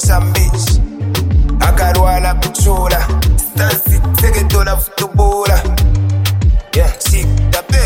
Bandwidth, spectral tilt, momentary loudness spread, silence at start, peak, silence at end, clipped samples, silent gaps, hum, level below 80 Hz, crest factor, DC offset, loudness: 17 kHz; -4.5 dB/octave; 3 LU; 0 s; 0 dBFS; 0 s; under 0.1%; none; none; -14 dBFS; 10 dB; under 0.1%; -13 LUFS